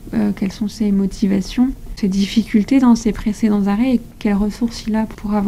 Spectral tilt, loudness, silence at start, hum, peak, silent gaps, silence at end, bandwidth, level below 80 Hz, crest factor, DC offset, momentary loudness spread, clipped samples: -6.5 dB/octave; -18 LUFS; 0 s; none; -2 dBFS; none; 0 s; 13.5 kHz; -34 dBFS; 14 dB; under 0.1%; 7 LU; under 0.1%